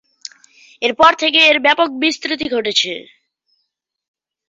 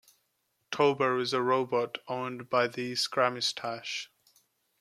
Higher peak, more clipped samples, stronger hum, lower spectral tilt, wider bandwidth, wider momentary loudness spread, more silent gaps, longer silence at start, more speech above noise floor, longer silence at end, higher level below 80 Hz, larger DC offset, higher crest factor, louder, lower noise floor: first, 0 dBFS vs -10 dBFS; neither; neither; second, -1.5 dB/octave vs -3.5 dB/octave; second, 8.2 kHz vs 14.5 kHz; first, 21 LU vs 9 LU; neither; about the same, 0.8 s vs 0.7 s; first, 58 dB vs 48 dB; first, 1.45 s vs 0.75 s; first, -58 dBFS vs -80 dBFS; neither; about the same, 18 dB vs 20 dB; first, -14 LUFS vs -30 LUFS; second, -73 dBFS vs -77 dBFS